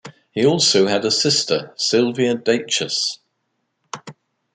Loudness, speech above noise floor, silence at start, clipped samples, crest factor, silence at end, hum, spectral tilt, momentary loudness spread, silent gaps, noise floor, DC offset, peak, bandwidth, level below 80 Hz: -18 LUFS; 54 dB; 0.05 s; under 0.1%; 18 dB; 0.45 s; none; -3 dB/octave; 20 LU; none; -72 dBFS; under 0.1%; -4 dBFS; 9.6 kHz; -66 dBFS